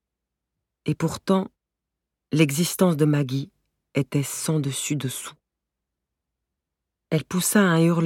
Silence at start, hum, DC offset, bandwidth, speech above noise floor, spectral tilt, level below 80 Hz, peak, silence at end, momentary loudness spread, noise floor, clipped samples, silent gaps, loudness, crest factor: 0.85 s; none; under 0.1%; 17.5 kHz; 63 dB; -5.5 dB/octave; -64 dBFS; -4 dBFS; 0 s; 12 LU; -85 dBFS; under 0.1%; none; -23 LUFS; 20 dB